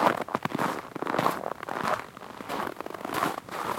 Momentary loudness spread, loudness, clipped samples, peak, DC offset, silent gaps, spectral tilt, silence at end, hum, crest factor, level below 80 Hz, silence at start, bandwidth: 8 LU; -31 LUFS; under 0.1%; -6 dBFS; under 0.1%; none; -4.5 dB/octave; 0 s; none; 24 dB; -66 dBFS; 0 s; 17 kHz